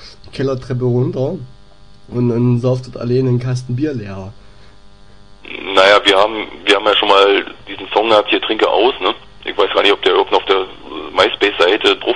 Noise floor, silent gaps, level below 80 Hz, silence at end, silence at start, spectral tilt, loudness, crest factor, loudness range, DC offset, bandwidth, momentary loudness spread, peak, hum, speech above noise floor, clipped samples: -44 dBFS; none; -46 dBFS; 0 s; 0 s; -5.5 dB/octave; -14 LUFS; 16 dB; 6 LU; 1%; 10.5 kHz; 16 LU; 0 dBFS; none; 30 dB; under 0.1%